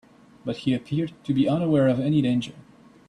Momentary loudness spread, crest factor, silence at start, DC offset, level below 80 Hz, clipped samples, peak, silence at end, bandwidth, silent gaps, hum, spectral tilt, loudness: 11 LU; 14 dB; 0.45 s; under 0.1%; -60 dBFS; under 0.1%; -10 dBFS; 0.5 s; 10 kHz; none; none; -8 dB/octave; -24 LUFS